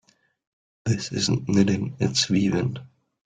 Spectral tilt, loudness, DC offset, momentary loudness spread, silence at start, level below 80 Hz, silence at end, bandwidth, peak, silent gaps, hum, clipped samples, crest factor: -5 dB/octave; -24 LUFS; under 0.1%; 9 LU; 0.85 s; -56 dBFS; 0.4 s; 9.4 kHz; -6 dBFS; none; none; under 0.1%; 20 dB